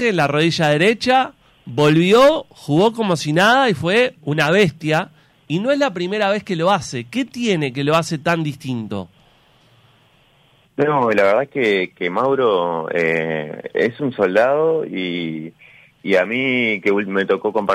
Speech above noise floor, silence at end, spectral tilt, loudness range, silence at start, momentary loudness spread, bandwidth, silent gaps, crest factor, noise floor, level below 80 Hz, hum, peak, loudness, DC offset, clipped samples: 38 dB; 0 s; -5.5 dB/octave; 7 LU; 0 s; 11 LU; 16 kHz; none; 14 dB; -55 dBFS; -58 dBFS; none; -4 dBFS; -18 LUFS; under 0.1%; under 0.1%